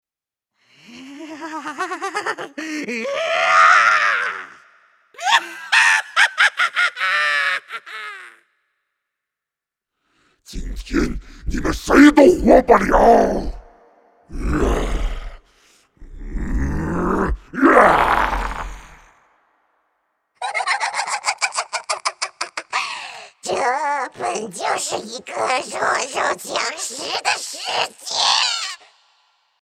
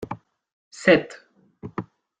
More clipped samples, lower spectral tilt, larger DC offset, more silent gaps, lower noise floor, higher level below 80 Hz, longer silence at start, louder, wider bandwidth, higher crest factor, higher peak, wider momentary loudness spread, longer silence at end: neither; second, -3.5 dB/octave vs -5.5 dB/octave; neither; second, none vs 0.53-0.71 s; first, -88 dBFS vs -43 dBFS; first, -32 dBFS vs -62 dBFS; first, 0.9 s vs 0 s; about the same, -18 LUFS vs -20 LUFS; first, 15.5 kHz vs 9.4 kHz; about the same, 20 dB vs 24 dB; about the same, 0 dBFS vs -2 dBFS; second, 19 LU vs 22 LU; first, 0.85 s vs 0.35 s